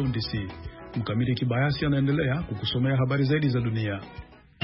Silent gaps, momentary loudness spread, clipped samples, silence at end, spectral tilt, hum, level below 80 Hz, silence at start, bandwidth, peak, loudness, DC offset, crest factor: none; 12 LU; under 0.1%; 0.3 s; -11.5 dB/octave; none; -48 dBFS; 0 s; 5.8 kHz; -14 dBFS; -26 LUFS; under 0.1%; 12 dB